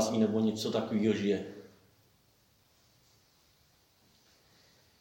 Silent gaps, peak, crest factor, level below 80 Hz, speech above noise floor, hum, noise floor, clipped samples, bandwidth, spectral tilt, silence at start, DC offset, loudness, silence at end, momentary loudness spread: none; -16 dBFS; 20 dB; -76 dBFS; 38 dB; none; -68 dBFS; under 0.1%; 17 kHz; -5.5 dB/octave; 0 s; under 0.1%; -31 LUFS; 3.35 s; 12 LU